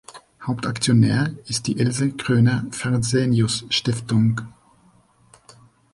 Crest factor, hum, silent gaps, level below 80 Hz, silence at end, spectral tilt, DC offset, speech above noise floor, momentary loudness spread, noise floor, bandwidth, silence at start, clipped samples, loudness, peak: 16 dB; none; none; -52 dBFS; 1.45 s; -5.5 dB/octave; under 0.1%; 36 dB; 9 LU; -56 dBFS; 11.5 kHz; 0.1 s; under 0.1%; -21 LUFS; -6 dBFS